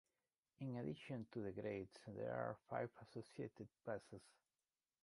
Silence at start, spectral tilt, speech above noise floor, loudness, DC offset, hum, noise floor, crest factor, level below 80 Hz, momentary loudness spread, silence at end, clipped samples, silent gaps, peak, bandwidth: 0.6 s; -7.5 dB/octave; over 40 dB; -50 LUFS; under 0.1%; none; under -90 dBFS; 22 dB; -78 dBFS; 8 LU; 0.7 s; under 0.1%; none; -30 dBFS; 11.5 kHz